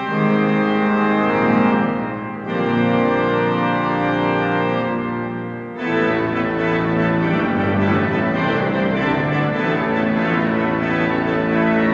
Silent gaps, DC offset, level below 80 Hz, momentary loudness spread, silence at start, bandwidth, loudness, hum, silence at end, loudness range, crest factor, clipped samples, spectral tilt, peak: none; under 0.1%; -50 dBFS; 5 LU; 0 s; 7.2 kHz; -18 LUFS; none; 0 s; 2 LU; 14 dB; under 0.1%; -8.5 dB/octave; -4 dBFS